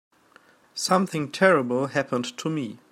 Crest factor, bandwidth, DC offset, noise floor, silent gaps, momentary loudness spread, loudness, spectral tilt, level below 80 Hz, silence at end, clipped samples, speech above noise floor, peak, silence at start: 20 dB; 15.5 kHz; under 0.1%; -57 dBFS; none; 10 LU; -24 LUFS; -4.5 dB/octave; -74 dBFS; 0.15 s; under 0.1%; 33 dB; -4 dBFS; 0.75 s